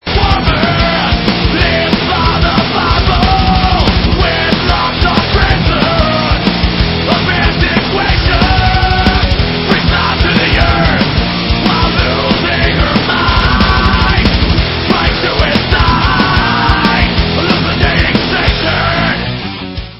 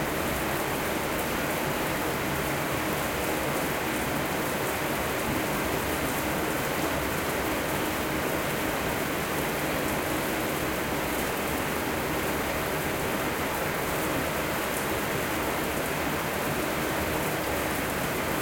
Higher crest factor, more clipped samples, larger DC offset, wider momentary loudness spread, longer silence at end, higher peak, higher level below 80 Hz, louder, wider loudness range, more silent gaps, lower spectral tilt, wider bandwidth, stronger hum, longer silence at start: about the same, 10 dB vs 14 dB; first, 0.2% vs under 0.1%; neither; about the same, 2 LU vs 1 LU; about the same, 0 s vs 0 s; first, 0 dBFS vs -14 dBFS; first, -16 dBFS vs -44 dBFS; first, -10 LUFS vs -28 LUFS; about the same, 1 LU vs 0 LU; neither; first, -7.5 dB/octave vs -4 dB/octave; second, 8 kHz vs 17 kHz; neither; about the same, 0.05 s vs 0 s